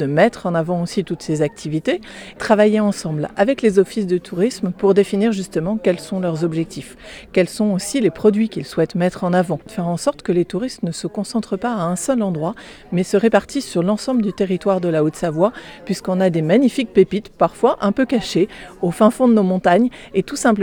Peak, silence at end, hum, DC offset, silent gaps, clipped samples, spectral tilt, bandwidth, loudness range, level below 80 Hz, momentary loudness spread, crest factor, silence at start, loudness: 0 dBFS; 0 s; none; under 0.1%; none; under 0.1%; -6 dB/octave; 18 kHz; 4 LU; -50 dBFS; 9 LU; 18 dB; 0 s; -18 LUFS